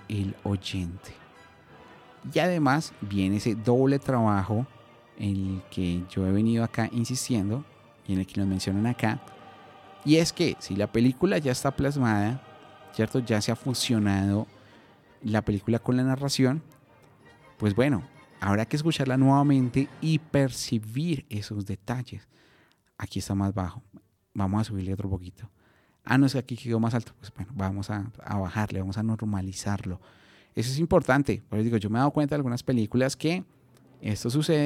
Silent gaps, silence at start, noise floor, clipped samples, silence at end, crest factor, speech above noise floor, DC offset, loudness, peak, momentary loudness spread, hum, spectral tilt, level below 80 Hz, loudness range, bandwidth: none; 0 s; -63 dBFS; under 0.1%; 0 s; 20 dB; 37 dB; under 0.1%; -27 LUFS; -6 dBFS; 12 LU; none; -6 dB/octave; -54 dBFS; 6 LU; 16 kHz